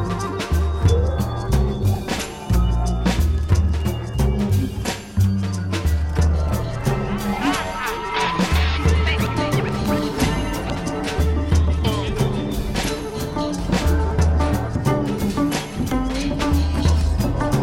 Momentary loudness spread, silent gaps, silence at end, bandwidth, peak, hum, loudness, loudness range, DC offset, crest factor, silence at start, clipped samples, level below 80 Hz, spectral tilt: 6 LU; none; 0 s; 16 kHz; -6 dBFS; none; -21 LUFS; 1 LU; under 0.1%; 14 dB; 0 s; under 0.1%; -24 dBFS; -6 dB/octave